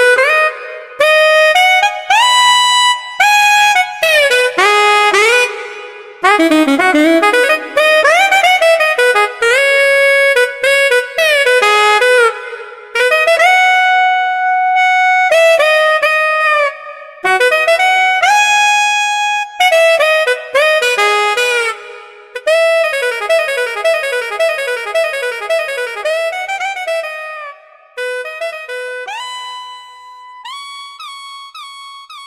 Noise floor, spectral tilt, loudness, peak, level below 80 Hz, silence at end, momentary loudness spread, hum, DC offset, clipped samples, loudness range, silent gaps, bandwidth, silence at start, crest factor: -36 dBFS; 0 dB/octave; -10 LUFS; 0 dBFS; -66 dBFS; 0 s; 18 LU; none; 0.1%; under 0.1%; 12 LU; none; 16 kHz; 0 s; 12 dB